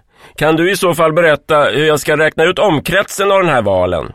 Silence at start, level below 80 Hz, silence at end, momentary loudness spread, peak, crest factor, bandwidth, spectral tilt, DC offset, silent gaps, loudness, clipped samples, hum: 0.4 s; -42 dBFS; 0.05 s; 3 LU; 0 dBFS; 12 dB; 16.5 kHz; -4.5 dB/octave; 0.5%; none; -12 LUFS; under 0.1%; none